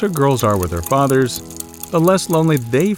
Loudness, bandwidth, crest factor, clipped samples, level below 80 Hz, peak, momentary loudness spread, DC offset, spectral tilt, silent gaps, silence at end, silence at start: -16 LUFS; 17.5 kHz; 14 dB; under 0.1%; -42 dBFS; -2 dBFS; 9 LU; under 0.1%; -6 dB/octave; none; 0 s; 0 s